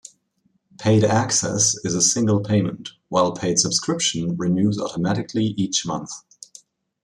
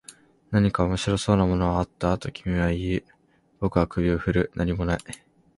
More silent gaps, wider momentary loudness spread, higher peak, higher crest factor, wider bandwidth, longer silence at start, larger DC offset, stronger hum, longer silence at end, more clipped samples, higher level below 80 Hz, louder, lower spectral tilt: neither; about the same, 9 LU vs 8 LU; about the same, -4 dBFS vs -6 dBFS; about the same, 18 dB vs 20 dB; about the same, 12.5 kHz vs 11.5 kHz; first, 0.8 s vs 0.1 s; neither; neither; first, 0.85 s vs 0.4 s; neither; second, -58 dBFS vs -38 dBFS; first, -20 LUFS vs -25 LUFS; second, -4 dB/octave vs -6.5 dB/octave